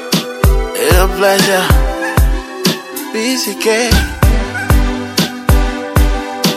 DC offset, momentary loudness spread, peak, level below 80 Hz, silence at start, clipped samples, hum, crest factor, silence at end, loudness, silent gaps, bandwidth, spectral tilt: under 0.1%; 6 LU; 0 dBFS; -16 dBFS; 0 s; under 0.1%; none; 12 dB; 0 s; -14 LUFS; none; 16 kHz; -4.5 dB/octave